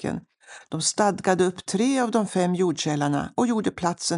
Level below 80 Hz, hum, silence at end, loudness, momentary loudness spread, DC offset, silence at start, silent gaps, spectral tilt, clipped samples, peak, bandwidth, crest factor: -60 dBFS; none; 0 s; -24 LUFS; 4 LU; under 0.1%; 0 s; none; -4.5 dB/octave; under 0.1%; -8 dBFS; 11.5 kHz; 16 dB